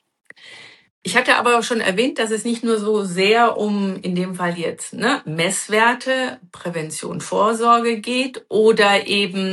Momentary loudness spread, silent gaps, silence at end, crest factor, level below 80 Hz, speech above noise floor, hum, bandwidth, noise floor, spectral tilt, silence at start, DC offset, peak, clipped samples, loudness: 11 LU; 0.90-1.02 s; 0 s; 18 dB; -70 dBFS; 24 dB; none; 12.5 kHz; -43 dBFS; -4 dB/octave; 0.45 s; under 0.1%; -2 dBFS; under 0.1%; -18 LUFS